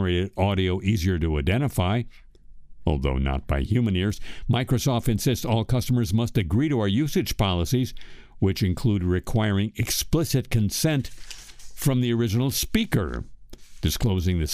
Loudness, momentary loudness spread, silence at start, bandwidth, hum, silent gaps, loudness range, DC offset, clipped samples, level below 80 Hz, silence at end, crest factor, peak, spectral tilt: -24 LUFS; 6 LU; 0 s; 15.5 kHz; none; none; 2 LU; under 0.1%; under 0.1%; -36 dBFS; 0 s; 16 dB; -8 dBFS; -5.5 dB/octave